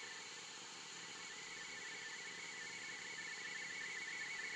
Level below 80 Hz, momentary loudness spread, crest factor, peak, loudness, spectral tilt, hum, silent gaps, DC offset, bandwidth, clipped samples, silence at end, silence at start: -88 dBFS; 5 LU; 14 dB; -36 dBFS; -47 LUFS; 0 dB/octave; none; none; under 0.1%; 13 kHz; under 0.1%; 0 s; 0 s